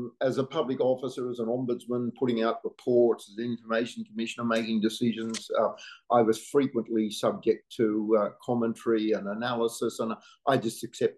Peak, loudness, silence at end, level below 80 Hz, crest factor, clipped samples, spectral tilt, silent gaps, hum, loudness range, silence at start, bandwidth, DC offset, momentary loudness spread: -10 dBFS; -29 LUFS; 0.05 s; -78 dBFS; 18 dB; under 0.1%; -5.5 dB/octave; none; none; 2 LU; 0 s; 12.5 kHz; under 0.1%; 9 LU